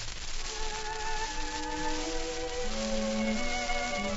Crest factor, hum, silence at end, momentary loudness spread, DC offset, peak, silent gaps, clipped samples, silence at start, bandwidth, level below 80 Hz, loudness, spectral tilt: 16 dB; none; 0 s; 5 LU; under 0.1%; -16 dBFS; none; under 0.1%; 0 s; 8 kHz; -38 dBFS; -33 LUFS; -3 dB/octave